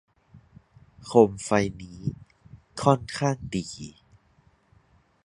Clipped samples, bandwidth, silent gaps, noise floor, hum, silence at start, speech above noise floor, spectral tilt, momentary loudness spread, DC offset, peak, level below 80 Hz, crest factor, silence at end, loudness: under 0.1%; 11.5 kHz; none; -62 dBFS; none; 1 s; 38 dB; -6 dB/octave; 22 LU; under 0.1%; -2 dBFS; -54 dBFS; 26 dB; 1.35 s; -25 LUFS